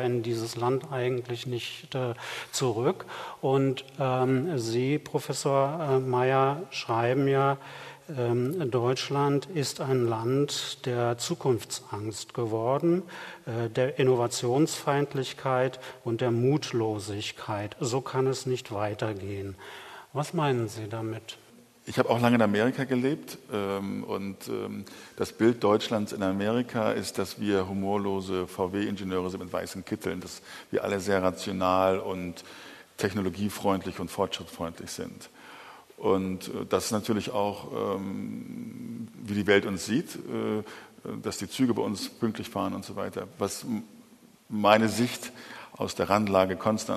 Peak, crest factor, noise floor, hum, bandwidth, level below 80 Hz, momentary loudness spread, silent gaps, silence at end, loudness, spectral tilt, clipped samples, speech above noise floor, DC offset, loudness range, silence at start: -4 dBFS; 24 dB; -56 dBFS; none; 13.5 kHz; -70 dBFS; 13 LU; none; 0 s; -29 LUFS; -5.5 dB/octave; under 0.1%; 27 dB; under 0.1%; 5 LU; 0 s